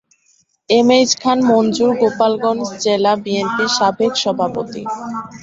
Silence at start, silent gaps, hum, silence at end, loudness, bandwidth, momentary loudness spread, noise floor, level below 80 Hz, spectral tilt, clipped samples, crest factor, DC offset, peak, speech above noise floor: 0.7 s; none; none; 0 s; -16 LUFS; 8 kHz; 12 LU; -58 dBFS; -58 dBFS; -3.5 dB/octave; under 0.1%; 16 dB; under 0.1%; 0 dBFS; 43 dB